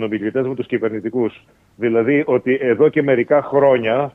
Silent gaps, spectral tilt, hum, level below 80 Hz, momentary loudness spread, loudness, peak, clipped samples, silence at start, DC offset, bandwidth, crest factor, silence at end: none; -9 dB/octave; none; -60 dBFS; 7 LU; -17 LUFS; -2 dBFS; under 0.1%; 0 s; under 0.1%; 3.9 kHz; 14 dB; 0.05 s